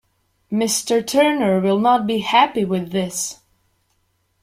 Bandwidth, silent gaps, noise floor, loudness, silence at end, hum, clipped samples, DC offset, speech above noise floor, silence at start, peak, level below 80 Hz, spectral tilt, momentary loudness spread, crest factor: 16.5 kHz; none; -66 dBFS; -18 LUFS; 1.1 s; none; under 0.1%; under 0.1%; 48 dB; 0.5 s; -2 dBFS; -60 dBFS; -4 dB/octave; 8 LU; 18 dB